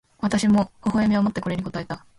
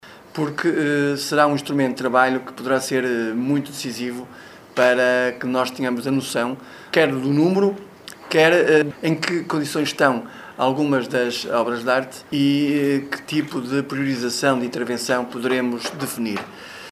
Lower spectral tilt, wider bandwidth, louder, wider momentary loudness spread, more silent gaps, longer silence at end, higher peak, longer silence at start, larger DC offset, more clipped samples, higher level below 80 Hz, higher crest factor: first, -6.5 dB/octave vs -5 dB/octave; second, 11.5 kHz vs 14 kHz; about the same, -23 LUFS vs -21 LUFS; about the same, 10 LU vs 10 LU; neither; first, 0.2 s vs 0 s; second, -10 dBFS vs 0 dBFS; first, 0.2 s vs 0.05 s; neither; neither; first, -50 dBFS vs -66 dBFS; second, 12 dB vs 20 dB